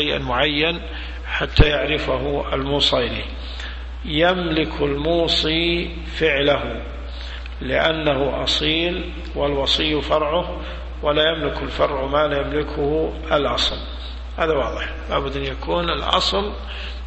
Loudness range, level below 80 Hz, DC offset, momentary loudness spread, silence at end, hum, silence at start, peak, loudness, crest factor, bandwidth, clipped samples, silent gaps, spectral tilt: 2 LU; -30 dBFS; under 0.1%; 13 LU; 0 s; none; 0 s; 0 dBFS; -20 LUFS; 20 dB; 8.4 kHz; under 0.1%; none; -5 dB/octave